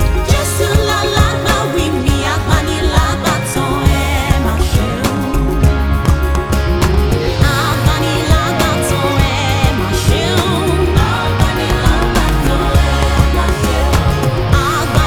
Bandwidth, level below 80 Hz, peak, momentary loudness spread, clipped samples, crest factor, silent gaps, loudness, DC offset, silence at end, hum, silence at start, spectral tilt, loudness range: 18.5 kHz; -18 dBFS; 0 dBFS; 2 LU; under 0.1%; 12 dB; none; -14 LUFS; under 0.1%; 0 s; none; 0 s; -5 dB/octave; 1 LU